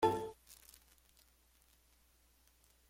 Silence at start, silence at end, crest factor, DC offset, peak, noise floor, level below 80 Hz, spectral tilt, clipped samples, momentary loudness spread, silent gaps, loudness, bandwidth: 0 s; 2.35 s; 26 dB; under 0.1%; -18 dBFS; -71 dBFS; -70 dBFS; -5.5 dB/octave; under 0.1%; 28 LU; none; -40 LUFS; 16.5 kHz